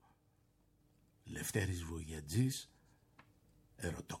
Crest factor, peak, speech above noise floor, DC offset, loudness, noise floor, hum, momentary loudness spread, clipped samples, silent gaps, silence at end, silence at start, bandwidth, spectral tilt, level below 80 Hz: 22 dB; -22 dBFS; 34 dB; under 0.1%; -41 LUFS; -74 dBFS; none; 13 LU; under 0.1%; none; 0 s; 1.25 s; 16.5 kHz; -5 dB/octave; -60 dBFS